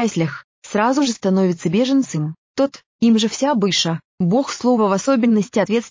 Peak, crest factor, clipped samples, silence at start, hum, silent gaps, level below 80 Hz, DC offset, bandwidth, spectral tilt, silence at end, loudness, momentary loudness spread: -6 dBFS; 12 dB; under 0.1%; 0 s; none; 0.44-0.62 s, 2.38-2.54 s, 2.86-2.99 s, 4.05-4.18 s; -62 dBFS; under 0.1%; 7.6 kHz; -5 dB/octave; 0 s; -18 LUFS; 7 LU